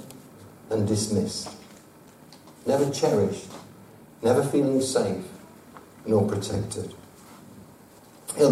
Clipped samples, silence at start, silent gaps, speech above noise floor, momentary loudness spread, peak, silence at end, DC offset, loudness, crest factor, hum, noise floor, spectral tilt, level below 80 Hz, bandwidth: under 0.1%; 0 s; none; 26 dB; 24 LU; -8 dBFS; 0 s; under 0.1%; -26 LUFS; 20 dB; none; -51 dBFS; -5.5 dB/octave; -60 dBFS; 16 kHz